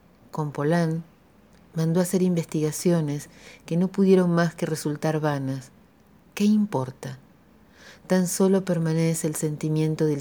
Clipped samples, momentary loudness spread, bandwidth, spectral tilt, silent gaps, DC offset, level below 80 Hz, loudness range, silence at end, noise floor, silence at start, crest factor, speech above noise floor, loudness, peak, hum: under 0.1%; 14 LU; over 20 kHz; -6.5 dB/octave; none; under 0.1%; -64 dBFS; 4 LU; 0 s; -56 dBFS; 0.35 s; 18 dB; 32 dB; -24 LUFS; -8 dBFS; none